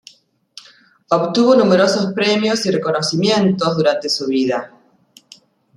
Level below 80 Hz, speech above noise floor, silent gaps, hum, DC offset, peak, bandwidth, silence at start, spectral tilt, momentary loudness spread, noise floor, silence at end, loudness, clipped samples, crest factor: -62 dBFS; 36 dB; none; none; under 0.1%; -2 dBFS; 12 kHz; 1.1 s; -5 dB/octave; 7 LU; -51 dBFS; 1.1 s; -16 LUFS; under 0.1%; 16 dB